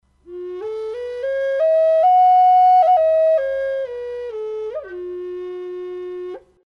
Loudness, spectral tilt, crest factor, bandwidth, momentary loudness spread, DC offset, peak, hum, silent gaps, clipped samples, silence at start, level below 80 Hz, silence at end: -17 LUFS; -5 dB/octave; 10 dB; 5.4 kHz; 18 LU; under 0.1%; -8 dBFS; none; none; under 0.1%; 0.3 s; -58 dBFS; 0.3 s